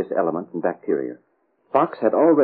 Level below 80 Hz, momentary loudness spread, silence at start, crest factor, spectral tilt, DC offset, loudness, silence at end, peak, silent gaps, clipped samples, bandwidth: -78 dBFS; 8 LU; 0 s; 16 dB; -7 dB/octave; under 0.1%; -22 LUFS; 0 s; -4 dBFS; none; under 0.1%; 4.5 kHz